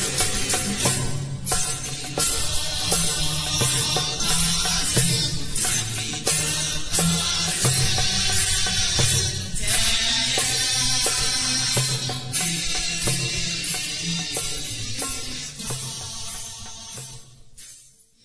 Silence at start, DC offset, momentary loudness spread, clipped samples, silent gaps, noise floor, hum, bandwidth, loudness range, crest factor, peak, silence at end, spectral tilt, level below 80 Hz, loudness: 0 s; 0.6%; 10 LU; under 0.1%; none; -51 dBFS; none; 11 kHz; 8 LU; 18 dB; -6 dBFS; 0 s; -2 dB/octave; -38 dBFS; -21 LUFS